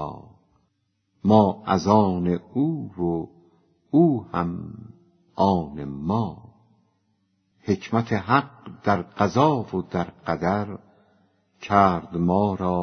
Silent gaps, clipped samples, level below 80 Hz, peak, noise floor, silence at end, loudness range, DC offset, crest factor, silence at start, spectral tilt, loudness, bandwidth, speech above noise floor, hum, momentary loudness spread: none; under 0.1%; -54 dBFS; -2 dBFS; -72 dBFS; 0 s; 4 LU; under 0.1%; 22 dB; 0 s; -8 dB/octave; -23 LUFS; 6.6 kHz; 50 dB; none; 16 LU